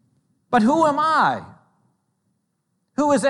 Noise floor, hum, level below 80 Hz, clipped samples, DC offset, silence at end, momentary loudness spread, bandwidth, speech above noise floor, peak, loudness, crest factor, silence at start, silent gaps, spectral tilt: -72 dBFS; none; -64 dBFS; under 0.1%; under 0.1%; 0 s; 11 LU; 11.5 kHz; 55 dB; -6 dBFS; -19 LUFS; 16 dB; 0.5 s; none; -5 dB/octave